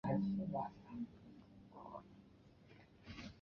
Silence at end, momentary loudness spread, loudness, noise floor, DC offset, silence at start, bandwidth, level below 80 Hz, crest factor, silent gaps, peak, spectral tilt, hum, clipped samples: 0 s; 24 LU; -46 LUFS; -65 dBFS; under 0.1%; 0.05 s; 6.6 kHz; -70 dBFS; 20 dB; none; -26 dBFS; -7.5 dB/octave; none; under 0.1%